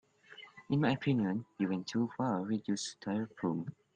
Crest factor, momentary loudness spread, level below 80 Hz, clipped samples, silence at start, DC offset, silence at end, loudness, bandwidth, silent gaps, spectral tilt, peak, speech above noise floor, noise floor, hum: 20 dB; 8 LU; -72 dBFS; under 0.1%; 0.3 s; under 0.1%; 0.25 s; -35 LUFS; 9.8 kHz; none; -6 dB/octave; -16 dBFS; 22 dB; -56 dBFS; none